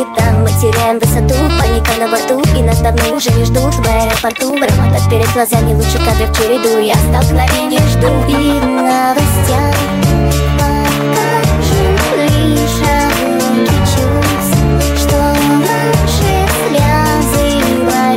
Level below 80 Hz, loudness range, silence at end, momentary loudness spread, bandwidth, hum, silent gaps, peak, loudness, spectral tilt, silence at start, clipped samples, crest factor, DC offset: -18 dBFS; 1 LU; 0 s; 2 LU; 16.5 kHz; none; none; 0 dBFS; -11 LUFS; -5.5 dB/octave; 0 s; under 0.1%; 10 dB; under 0.1%